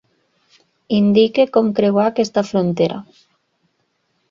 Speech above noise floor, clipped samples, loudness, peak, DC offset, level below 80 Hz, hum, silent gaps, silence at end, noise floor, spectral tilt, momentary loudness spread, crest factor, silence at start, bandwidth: 52 dB; under 0.1%; -16 LUFS; -2 dBFS; under 0.1%; -60 dBFS; none; none; 1.3 s; -67 dBFS; -7 dB/octave; 7 LU; 18 dB; 0.9 s; 7.6 kHz